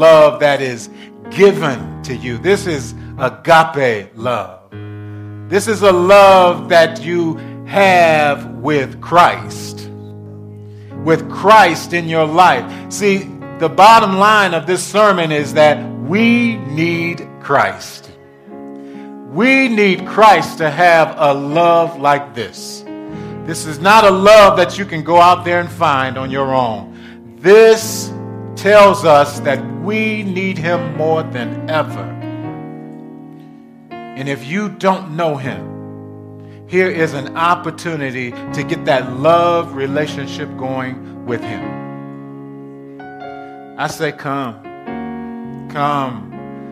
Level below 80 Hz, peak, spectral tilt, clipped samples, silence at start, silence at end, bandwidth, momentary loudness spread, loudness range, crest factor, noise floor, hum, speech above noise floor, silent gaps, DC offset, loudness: -48 dBFS; 0 dBFS; -5 dB/octave; under 0.1%; 0 s; 0 s; 15.5 kHz; 23 LU; 12 LU; 14 dB; -39 dBFS; none; 26 dB; none; under 0.1%; -13 LUFS